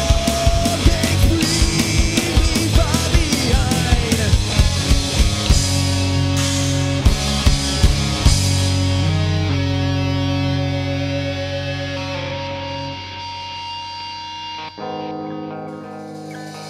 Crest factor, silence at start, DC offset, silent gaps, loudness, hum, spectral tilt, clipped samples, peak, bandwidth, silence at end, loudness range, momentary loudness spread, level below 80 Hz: 18 dB; 0 s; under 0.1%; none; -18 LUFS; none; -4.5 dB/octave; under 0.1%; 0 dBFS; 16 kHz; 0 s; 10 LU; 12 LU; -22 dBFS